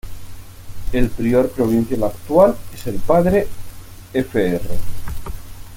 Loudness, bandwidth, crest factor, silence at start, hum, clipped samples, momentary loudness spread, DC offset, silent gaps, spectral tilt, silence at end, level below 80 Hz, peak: -18 LUFS; 17 kHz; 16 dB; 0.05 s; none; under 0.1%; 24 LU; under 0.1%; none; -7 dB/octave; 0 s; -30 dBFS; -2 dBFS